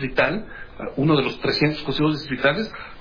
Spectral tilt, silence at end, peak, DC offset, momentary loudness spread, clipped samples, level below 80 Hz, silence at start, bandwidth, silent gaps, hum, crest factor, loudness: -7 dB/octave; 0 s; -4 dBFS; under 0.1%; 12 LU; under 0.1%; -44 dBFS; 0 s; 5.2 kHz; none; none; 18 dB; -22 LUFS